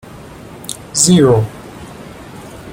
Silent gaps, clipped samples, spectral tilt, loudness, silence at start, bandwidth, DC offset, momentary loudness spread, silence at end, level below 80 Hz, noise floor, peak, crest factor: none; under 0.1%; -4.5 dB/octave; -12 LUFS; 0.15 s; 17 kHz; under 0.1%; 25 LU; 0 s; -44 dBFS; -34 dBFS; 0 dBFS; 16 dB